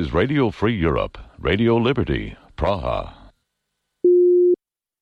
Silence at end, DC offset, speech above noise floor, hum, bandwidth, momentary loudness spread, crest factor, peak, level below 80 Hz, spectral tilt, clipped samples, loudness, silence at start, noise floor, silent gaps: 0.45 s; under 0.1%; 56 dB; none; 5 kHz; 12 LU; 12 dB; -8 dBFS; -36 dBFS; -8.5 dB/octave; under 0.1%; -20 LUFS; 0 s; -77 dBFS; none